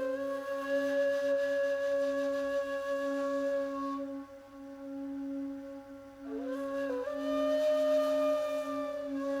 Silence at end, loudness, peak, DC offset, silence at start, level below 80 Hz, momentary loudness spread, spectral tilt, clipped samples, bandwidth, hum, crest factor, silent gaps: 0 s; -33 LUFS; -20 dBFS; under 0.1%; 0 s; -70 dBFS; 15 LU; -4 dB/octave; under 0.1%; 15 kHz; 50 Hz at -75 dBFS; 12 dB; none